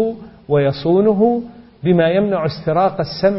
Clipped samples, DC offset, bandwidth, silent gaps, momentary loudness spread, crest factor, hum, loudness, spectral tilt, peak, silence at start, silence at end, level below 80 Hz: under 0.1%; under 0.1%; 5.8 kHz; none; 9 LU; 14 dB; none; -16 LUFS; -11 dB/octave; -2 dBFS; 0 s; 0 s; -50 dBFS